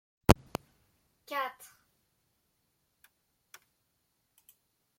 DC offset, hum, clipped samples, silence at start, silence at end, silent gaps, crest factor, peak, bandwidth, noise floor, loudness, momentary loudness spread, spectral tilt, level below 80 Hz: under 0.1%; none; under 0.1%; 0.3 s; 3.5 s; none; 36 dB; -2 dBFS; 16.5 kHz; -78 dBFS; -31 LUFS; 25 LU; -5.5 dB/octave; -48 dBFS